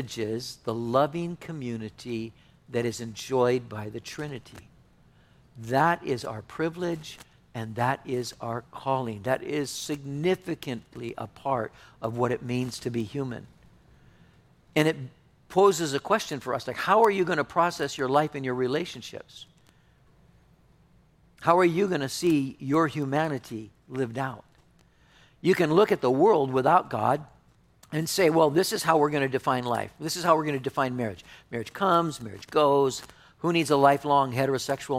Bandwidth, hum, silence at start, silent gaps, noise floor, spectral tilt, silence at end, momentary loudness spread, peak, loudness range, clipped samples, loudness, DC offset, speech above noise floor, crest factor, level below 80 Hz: 16 kHz; none; 0 s; none; -60 dBFS; -5.5 dB/octave; 0 s; 15 LU; -6 dBFS; 7 LU; under 0.1%; -26 LUFS; under 0.1%; 34 dB; 22 dB; -62 dBFS